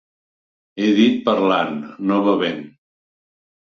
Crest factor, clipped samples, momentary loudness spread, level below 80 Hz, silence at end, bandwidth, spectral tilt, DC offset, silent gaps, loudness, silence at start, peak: 18 dB; under 0.1%; 10 LU; -64 dBFS; 0.95 s; 6.8 kHz; -6.5 dB/octave; under 0.1%; none; -18 LUFS; 0.75 s; -2 dBFS